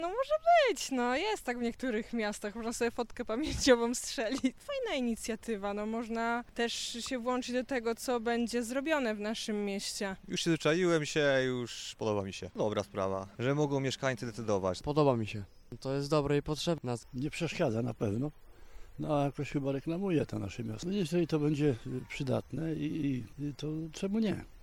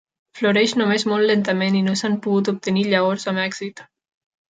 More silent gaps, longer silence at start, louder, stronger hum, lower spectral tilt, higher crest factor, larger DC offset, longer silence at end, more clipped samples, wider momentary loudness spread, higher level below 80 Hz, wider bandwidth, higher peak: neither; second, 0 s vs 0.35 s; second, -33 LUFS vs -19 LUFS; neither; about the same, -5 dB/octave vs -5 dB/octave; about the same, 22 dB vs 18 dB; neither; second, 0 s vs 0.7 s; neither; first, 9 LU vs 6 LU; first, -56 dBFS vs -66 dBFS; first, 16.5 kHz vs 9.2 kHz; second, -10 dBFS vs -4 dBFS